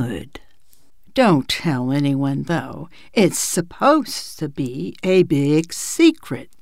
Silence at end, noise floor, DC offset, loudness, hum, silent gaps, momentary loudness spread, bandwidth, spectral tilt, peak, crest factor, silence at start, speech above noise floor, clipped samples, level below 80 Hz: 0.15 s; -59 dBFS; 0.8%; -19 LUFS; none; none; 12 LU; 16 kHz; -5 dB/octave; -2 dBFS; 18 dB; 0 s; 40 dB; under 0.1%; -52 dBFS